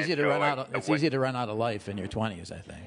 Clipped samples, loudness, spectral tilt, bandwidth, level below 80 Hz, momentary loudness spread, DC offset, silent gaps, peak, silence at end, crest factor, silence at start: under 0.1%; -29 LUFS; -6 dB/octave; 11 kHz; -60 dBFS; 10 LU; under 0.1%; none; -12 dBFS; 0 s; 16 dB; 0 s